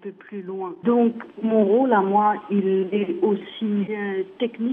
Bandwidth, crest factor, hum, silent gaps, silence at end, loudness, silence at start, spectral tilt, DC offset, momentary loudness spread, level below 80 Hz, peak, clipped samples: 3.8 kHz; 16 dB; none; none; 0 s; -22 LUFS; 0.05 s; -10 dB/octave; under 0.1%; 12 LU; -74 dBFS; -6 dBFS; under 0.1%